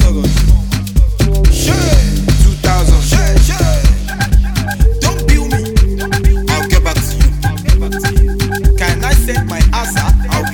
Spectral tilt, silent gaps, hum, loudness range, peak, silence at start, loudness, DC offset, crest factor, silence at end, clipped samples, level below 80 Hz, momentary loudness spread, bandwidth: -5 dB/octave; none; none; 2 LU; 0 dBFS; 0 s; -13 LUFS; 0.2%; 10 dB; 0 s; under 0.1%; -12 dBFS; 3 LU; 17.5 kHz